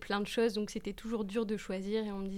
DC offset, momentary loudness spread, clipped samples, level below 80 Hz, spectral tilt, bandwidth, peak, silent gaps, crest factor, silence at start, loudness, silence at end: under 0.1%; 7 LU; under 0.1%; -56 dBFS; -5.5 dB/octave; 15.5 kHz; -20 dBFS; none; 16 dB; 0 s; -35 LUFS; 0 s